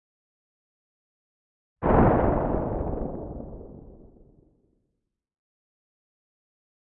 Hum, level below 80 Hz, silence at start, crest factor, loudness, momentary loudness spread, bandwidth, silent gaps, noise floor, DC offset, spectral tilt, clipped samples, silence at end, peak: none; -38 dBFS; 1.8 s; 24 dB; -25 LUFS; 22 LU; 3.8 kHz; none; -79 dBFS; under 0.1%; -13 dB/octave; under 0.1%; 2.95 s; -6 dBFS